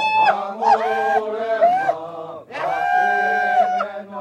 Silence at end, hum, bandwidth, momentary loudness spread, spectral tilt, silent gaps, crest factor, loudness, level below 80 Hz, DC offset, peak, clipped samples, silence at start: 0 s; none; 10 kHz; 11 LU; -4 dB/octave; none; 16 dB; -19 LUFS; -66 dBFS; under 0.1%; -4 dBFS; under 0.1%; 0 s